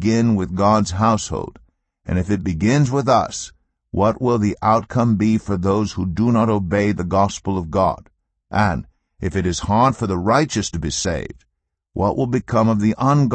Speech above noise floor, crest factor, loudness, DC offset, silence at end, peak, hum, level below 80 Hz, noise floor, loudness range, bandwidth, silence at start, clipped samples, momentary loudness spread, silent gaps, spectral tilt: 56 dB; 16 dB; -19 LUFS; under 0.1%; 0 s; -2 dBFS; none; -40 dBFS; -74 dBFS; 2 LU; 8.8 kHz; 0 s; under 0.1%; 10 LU; none; -6 dB/octave